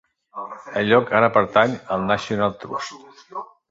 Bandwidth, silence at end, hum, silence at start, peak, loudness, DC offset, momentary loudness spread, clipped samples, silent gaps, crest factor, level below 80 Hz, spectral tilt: 7.8 kHz; 0.25 s; none; 0.35 s; -2 dBFS; -20 LUFS; under 0.1%; 19 LU; under 0.1%; none; 20 dB; -56 dBFS; -5.5 dB/octave